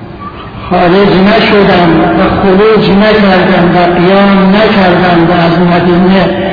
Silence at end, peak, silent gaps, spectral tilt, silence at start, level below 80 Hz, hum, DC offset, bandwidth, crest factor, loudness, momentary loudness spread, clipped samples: 0 s; 0 dBFS; none; -8.5 dB/octave; 0 s; -28 dBFS; none; under 0.1%; 5.4 kHz; 6 dB; -6 LUFS; 3 LU; 0.7%